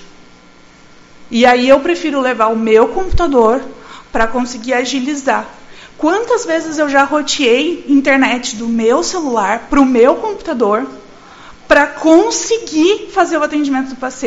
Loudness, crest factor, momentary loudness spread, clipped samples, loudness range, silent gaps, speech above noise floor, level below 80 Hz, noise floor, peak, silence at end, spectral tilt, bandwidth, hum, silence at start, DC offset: -13 LUFS; 14 dB; 8 LU; 0.2%; 3 LU; none; 29 dB; -32 dBFS; -42 dBFS; 0 dBFS; 0 s; -3.5 dB/octave; 8 kHz; none; 0 s; under 0.1%